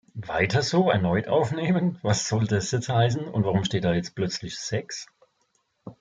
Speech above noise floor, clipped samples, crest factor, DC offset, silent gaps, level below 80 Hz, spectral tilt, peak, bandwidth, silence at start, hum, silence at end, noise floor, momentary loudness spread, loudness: 47 dB; under 0.1%; 18 dB; under 0.1%; none; -56 dBFS; -5.5 dB/octave; -8 dBFS; 9.4 kHz; 0.15 s; none; 0.1 s; -71 dBFS; 8 LU; -25 LUFS